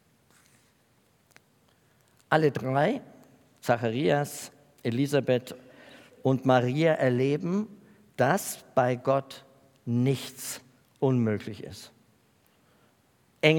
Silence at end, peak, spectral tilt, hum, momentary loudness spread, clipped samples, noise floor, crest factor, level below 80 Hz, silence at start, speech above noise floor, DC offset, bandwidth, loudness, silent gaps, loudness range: 0 s; -4 dBFS; -6 dB/octave; none; 18 LU; under 0.1%; -66 dBFS; 24 dB; -76 dBFS; 2.3 s; 39 dB; under 0.1%; 18 kHz; -27 LUFS; none; 5 LU